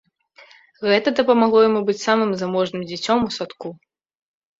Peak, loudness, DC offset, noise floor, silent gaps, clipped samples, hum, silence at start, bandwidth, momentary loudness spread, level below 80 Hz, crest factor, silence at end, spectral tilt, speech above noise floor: -2 dBFS; -19 LUFS; under 0.1%; -50 dBFS; none; under 0.1%; none; 0.8 s; 7.8 kHz; 13 LU; -60 dBFS; 18 dB; 0.85 s; -5 dB/octave; 32 dB